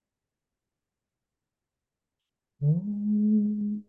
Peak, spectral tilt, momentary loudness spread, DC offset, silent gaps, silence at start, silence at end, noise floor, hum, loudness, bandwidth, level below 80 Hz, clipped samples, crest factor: -16 dBFS; -14.5 dB/octave; 5 LU; under 0.1%; none; 2.6 s; 0.05 s; -88 dBFS; none; -27 LUFS; 0.9 kHz; -78 dBFS; under 0.1%; 14 dB